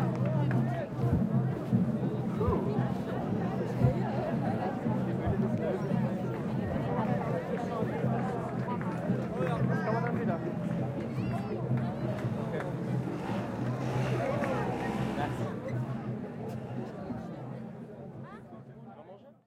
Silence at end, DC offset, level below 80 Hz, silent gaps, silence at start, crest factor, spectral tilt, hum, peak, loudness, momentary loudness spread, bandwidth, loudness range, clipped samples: 0.15 s; under 0.1%; -54 dBFS; none; 0 s; 18 dB; -8.5 dB/octave; none; -14 dBFS; -32 LUFS; 10 LU; 11 kHz; 6 LU; under 0.1%